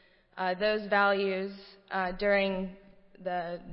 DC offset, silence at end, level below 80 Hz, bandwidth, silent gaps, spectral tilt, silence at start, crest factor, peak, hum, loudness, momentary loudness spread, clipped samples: under 0.1%; 0 s; -56 dBFS; 5.8 kHz; none; -9 dB/octave; 0.35 s; 16 dB; -14 dBFS; none; -30 LUFS; 15 LU; under 0.1%